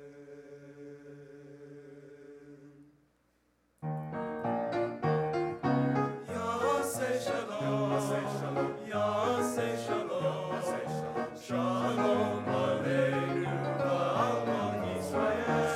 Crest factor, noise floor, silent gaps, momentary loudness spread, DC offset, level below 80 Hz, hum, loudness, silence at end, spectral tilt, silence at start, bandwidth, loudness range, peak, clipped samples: 16 dB; -72 dBFS; none; 21 LU; under 0.1%; -68 dBFS; none; -32 LUFS; 0 s; -6 dB/octave; 0 s; 16 kHz; 14 LU; -16 dBFS; under 0.1%